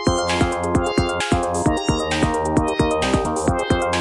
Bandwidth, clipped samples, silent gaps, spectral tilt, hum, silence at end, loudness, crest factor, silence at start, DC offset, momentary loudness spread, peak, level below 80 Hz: 11.5 kHz; under 0.1%; none; -5 dB/octave; none; 0 s; -20 LUFS; 16 dB; 0 s; under 0.1%; 2 LU; -4 dBFS; -32 dBFS